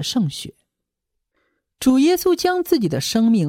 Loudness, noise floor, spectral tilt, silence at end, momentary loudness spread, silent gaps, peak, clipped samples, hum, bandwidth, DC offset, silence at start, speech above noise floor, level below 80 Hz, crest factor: -18 LUFS; -80 dBFS; -5 dB/octave; 0 s; 9 LU; none; -4 dBFS; under 0.1%; none; 17 kHz; under 0.1%; 0 s; 62 dB; -54 dBFS; 16 dB